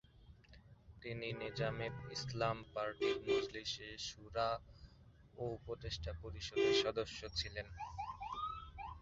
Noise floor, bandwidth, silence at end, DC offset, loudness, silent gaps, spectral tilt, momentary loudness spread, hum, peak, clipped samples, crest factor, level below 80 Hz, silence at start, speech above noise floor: -63 dBFS; 7.6 kHz; 0 s; under 0.1%; -41 LUFS; none; -3 dB/octave; 12 LU; none; -22 dBFS; under 0.1%; 20 dB; -58 dBFS; 0.15 s; 22 dB